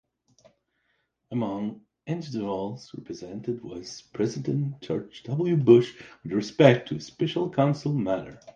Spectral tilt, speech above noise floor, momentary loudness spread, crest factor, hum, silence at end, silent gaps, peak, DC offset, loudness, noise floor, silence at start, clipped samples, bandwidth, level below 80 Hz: -7 dB/octave; 48 dB; 19 LU; 24 dB; none; 0.05 s; none; -2 dBFS; under 0.1%; -26 LUFS; -74 dBFS; 1.3 s; under 0.1%; 7.4 kHz; -64 dBFS